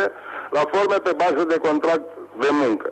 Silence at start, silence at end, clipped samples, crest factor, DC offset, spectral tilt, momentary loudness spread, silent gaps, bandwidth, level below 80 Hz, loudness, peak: 0 s; 0 s; under 0.1%; 12 dB; under 0.1%; -5 dB/octave; 6 LU; none; 8.8 kHz; -66 dBFS; -21 LUFS; -8 dBFS